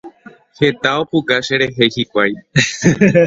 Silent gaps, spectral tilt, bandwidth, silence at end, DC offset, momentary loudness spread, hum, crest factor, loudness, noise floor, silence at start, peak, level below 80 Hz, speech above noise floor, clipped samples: none; -5 dB/octave; 8 kHz; 0 s; under 0.1%; 4 LU; none; 16 dB; -15 LUFS; -41 dBFS; 0.05 s; 0 dBFS; -48 dBFS; 26 dB; under 0.1%